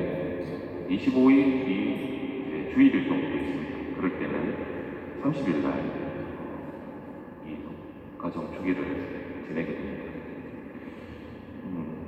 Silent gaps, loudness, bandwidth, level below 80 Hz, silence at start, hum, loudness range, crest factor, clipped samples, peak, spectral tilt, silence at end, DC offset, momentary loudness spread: none; -29 LUFS; 5.6 kHz; -58 dBFS; 0 s; none; 10 LU; 18 dB; under 0.1%; -10 dBFS; -8.5 dB/octave; 0 s; under 0.1%; 19 LU